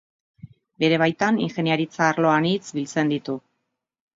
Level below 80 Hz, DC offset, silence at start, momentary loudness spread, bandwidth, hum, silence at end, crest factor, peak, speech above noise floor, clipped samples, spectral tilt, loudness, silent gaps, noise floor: -68 dBFS; under 0.1%; 0.45 s; 8 LU; 7.8 kHz; none; 0.75 s; 18 dB; -4 dBFS; 57 dB; under 0.1%; -5.5 dB/octave; -22 LUFS; none; -79 dBFS